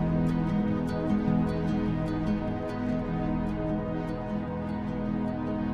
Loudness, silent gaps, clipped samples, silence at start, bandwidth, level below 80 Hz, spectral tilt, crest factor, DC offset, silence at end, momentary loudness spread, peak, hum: -30 LUFS; none; under 0.1%; 0 s; 8.6 kHz; -42 dBFS; -9 dB/octave; 14 dB; under 0.1%; 0 s; 6 LU; -16 dBFS; none